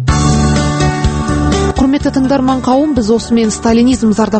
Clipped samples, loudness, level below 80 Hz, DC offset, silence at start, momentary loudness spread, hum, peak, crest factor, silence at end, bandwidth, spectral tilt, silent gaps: under 0.1%; -12 LUFS; -22 dBFS; under 0.1%; 0 s; 3 LU; none; 0 dBFS; 10 dB; 0 s; 8.8 kHz; -6 dB/octave; none